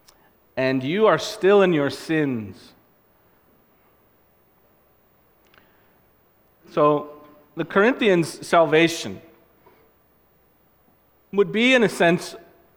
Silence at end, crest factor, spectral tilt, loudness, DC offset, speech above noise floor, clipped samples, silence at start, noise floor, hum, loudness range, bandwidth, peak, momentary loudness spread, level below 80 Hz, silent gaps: 0.4 s; 20 dB; -5 dB/octave; -20 LUFS; under 0.1%; 40 dB; under 0.1%; 0.55 s; -60 dBFS; none; 8 LU; 17.5 kHz; -2 dBFS; 17 LU; -64 dBFS; none